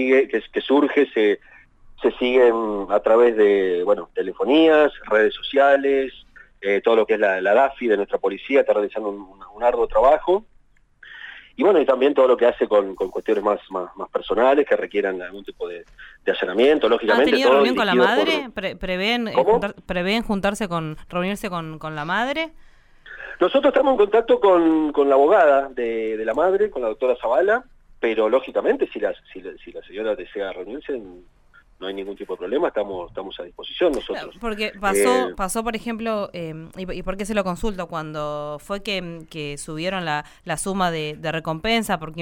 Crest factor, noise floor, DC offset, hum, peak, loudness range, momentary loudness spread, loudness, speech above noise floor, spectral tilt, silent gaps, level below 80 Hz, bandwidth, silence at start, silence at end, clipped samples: 14 dB; -55 dBFS; under 0.1%; none; -6 dBFS; 9 LU; 15 LU; -20 LUFS; 35 dB; -5 dB/octave; none; -46 dBFS; 16 kHz; 0 s; 0 s; under 0.1%